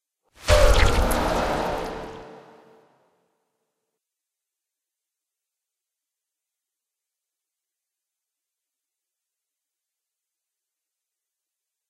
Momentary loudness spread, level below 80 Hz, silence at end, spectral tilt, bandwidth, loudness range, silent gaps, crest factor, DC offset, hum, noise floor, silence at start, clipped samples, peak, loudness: 18 LU; -32 dBFS; 9.55 s; -4.5 dB/octave; 15.5 kHz; 18 LU; none; 24 dB; under 0.1%; none; -86 dBFS; 0.45 s; under 0.1%; -4 dBFS; -22 LUFS